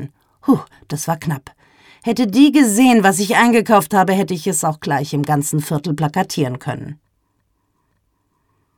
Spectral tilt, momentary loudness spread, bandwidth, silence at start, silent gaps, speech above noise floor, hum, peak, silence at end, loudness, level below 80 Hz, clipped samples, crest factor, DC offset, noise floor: -5 dB/octave; 15 LU; 18.5 kHz; 0 s; none; 50 dB; none; 0 dBFS; 1.85 s; -16 LUFS; -58 dBFS; under 0.1%; 16 dB; under 0.1%; -66 dBFS